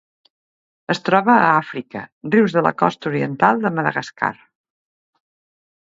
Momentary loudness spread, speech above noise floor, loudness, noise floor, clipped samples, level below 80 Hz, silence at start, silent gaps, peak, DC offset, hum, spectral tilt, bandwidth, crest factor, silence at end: 15 LU; over 72 dB; -18 LUFS; under -90 dBFS; under 0.1%; -64 dBFS; 0.9 s; 2.12-2.21 s; 0 dBFS; under 0.1%; none; -6.5 dB/octave; 7.8 kHz; 20 dB; 1.6 s